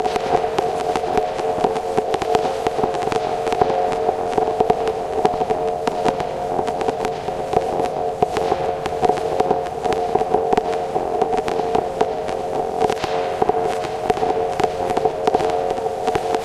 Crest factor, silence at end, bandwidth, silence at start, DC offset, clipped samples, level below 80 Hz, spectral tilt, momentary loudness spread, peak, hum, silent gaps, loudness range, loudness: 20 dB; 0 s; 13.5 kHz; 0 s; under 0.1%; under 0.1%; -44 dBFS; -5 dB/octave; 3 LU; 0 dBFS; none; none; 1 LU; -21 LUFS